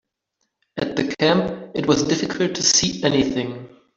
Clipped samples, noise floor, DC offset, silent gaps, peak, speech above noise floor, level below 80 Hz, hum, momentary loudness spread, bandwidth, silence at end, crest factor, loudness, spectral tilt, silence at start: under 0.1%; -75 dBFS; under 0.1%; none; -4 dBFS; 55 dB; -52 dBFS; none; 12 LU; 8 kHz; 0.3 s; 18 dB; -20 LUFS; -3.5 dB/octave; 0.75 s